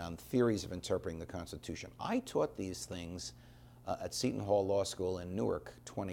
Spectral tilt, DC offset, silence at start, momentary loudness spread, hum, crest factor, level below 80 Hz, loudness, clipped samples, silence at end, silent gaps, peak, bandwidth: -5 dB/octave; under 0.1%; 0 s; 12 LU; none; 18 dB; -60 dBFS; -37 LUFS; under 0.1%; 0 s; none; -20 dBFS; 17.5 kHz